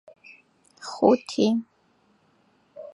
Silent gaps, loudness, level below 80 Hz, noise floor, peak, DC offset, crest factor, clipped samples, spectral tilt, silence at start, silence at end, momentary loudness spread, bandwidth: none; -23 LUFS; -74 dBFS; -64 dBFS; -4 dBFS; under 0.1%; 24 dB; under 0.1%; -5.5 dB/octave; 0.85 s; 0.05 s; 20 LU; 11 kHz